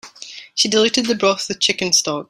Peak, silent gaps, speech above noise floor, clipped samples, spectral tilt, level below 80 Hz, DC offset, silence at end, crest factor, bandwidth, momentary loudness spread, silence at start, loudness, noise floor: -2 dBFS; none; 20 dB; under 0.1%; -2 dB/octave; -60 dBFS; under 0.1%; 0.05 s; 16 dB; 15.5 kHz; 14 LU; 0.05 s; -16 LUFS; -38 dBFS